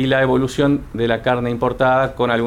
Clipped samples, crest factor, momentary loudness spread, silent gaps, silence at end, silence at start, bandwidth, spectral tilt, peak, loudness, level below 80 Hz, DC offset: under 0.1%; 14 dB; 4 LU; none; 0 s; 0 s; 14.5 kHz; -6.5 dB/octave; -4 dBFS; -18 LUFS; -40 dBFS; under 0.1%